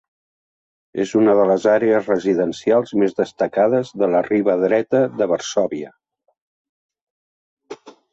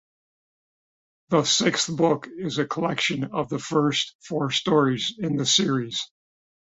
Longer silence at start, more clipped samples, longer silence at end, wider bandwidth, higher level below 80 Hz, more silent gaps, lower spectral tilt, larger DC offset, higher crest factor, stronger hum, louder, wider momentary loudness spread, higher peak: second, 0.95 s vs 1.3 s; neither; second, 0.2 s vs 0.6 s; about the same, 8 kHz vs 8.2 kHz; about the same, -62 dBFS vs -64 dBFS; first, 6.42-6.89 s, 7.02-7.57 s vs 4.15-4.19 s; first, -6 dB/octave vs -3.5 dB/octave; neither; about the same, 16 dB vs 20 dB; neither; first, -18 LUFS vs -23 LUFS; about the same, 10 LU vs 9 LU; about the same, -4 dBFS vs -6 dBFS